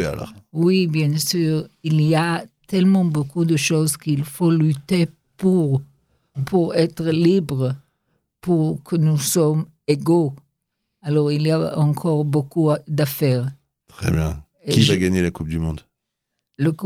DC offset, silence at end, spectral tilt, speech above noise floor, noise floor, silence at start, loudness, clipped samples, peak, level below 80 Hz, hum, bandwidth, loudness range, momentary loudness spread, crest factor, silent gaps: under 0.1%; 0 s; -6 dB/octave; 60 dB; -79 dBFS; 0 s; -20 LUFS; under 0.1%; -2 dBFS; -46 dBFS; none; 16 kHz; 2 LU; 9 LU; 18 dB; none